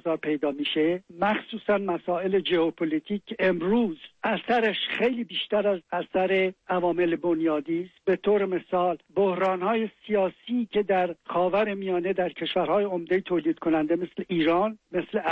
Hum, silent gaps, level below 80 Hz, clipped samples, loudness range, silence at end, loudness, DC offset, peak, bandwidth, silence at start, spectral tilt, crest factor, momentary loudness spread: none; none; -64 dBFS; under 0.1%; 1 LU; 0 s; -26 LUFS; under 0.1%; -14 dBFS; 5.8 kHz; 0.05 s; -7.5 dB/octave; 12 dB; 5 LU